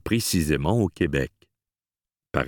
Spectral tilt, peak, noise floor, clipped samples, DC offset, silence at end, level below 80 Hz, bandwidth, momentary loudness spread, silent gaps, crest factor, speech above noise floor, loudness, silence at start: -5 dB/octave; -4 dBFS; under -90 dBFS; under 0.1%; under 0.1%; 0 s; -40 dBFS; 19 kHz; 7 LU; none; 22 dB; over 67 dB; -24 LUFS; 0.05 s